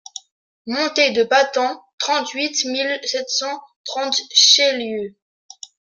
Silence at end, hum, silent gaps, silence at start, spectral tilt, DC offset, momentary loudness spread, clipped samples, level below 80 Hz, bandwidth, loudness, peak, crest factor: 0.9 s; none; 1.93-1.98 s, 3.76-3.84 s; 0.65 s; 0 dB/octave; under 0.1%; 23 LU; under 0.1%; -72 dBFS; 10.5 kHz; -17 LUFS; 0 dBFS; 20 dB